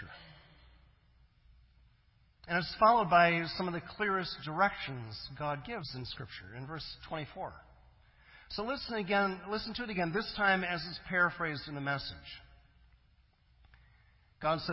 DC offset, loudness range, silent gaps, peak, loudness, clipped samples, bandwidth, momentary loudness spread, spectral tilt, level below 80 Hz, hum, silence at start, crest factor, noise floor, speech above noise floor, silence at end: under 0.1%; 11 LU; none; -14 dBFS; -33 LUFS; under 0.1%; 5.8 kHz; 18 LU; -8.5 dB/octave; -60 dBFS; none; 0 s; 22 dB; -67 dBFS; 34 dB; 0 s